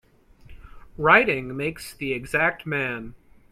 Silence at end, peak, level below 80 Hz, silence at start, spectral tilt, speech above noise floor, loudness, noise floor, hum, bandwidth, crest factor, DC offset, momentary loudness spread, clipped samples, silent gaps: 0.4 s; 0 dBFS; -50 dBFS; 0.5 s; -5 dB/octave; 27 dB; -22 LUFS; -50 dBFS; none; 15.5 kHz; 24 dB; under 0.1%; 15 LU; under 0.1%; none